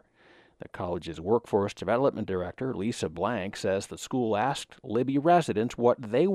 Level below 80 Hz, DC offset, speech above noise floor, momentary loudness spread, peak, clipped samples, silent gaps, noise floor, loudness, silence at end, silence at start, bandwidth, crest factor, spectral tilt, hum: -60 dBFS; under 0.1%; 32 dB; 10 LU; -10 dBFS; under 0.1%; none; -59 dBFS; -28 LUFS; 0 s; 0.65 s; 14 kHz; 18 dB; -6 dB/octave; none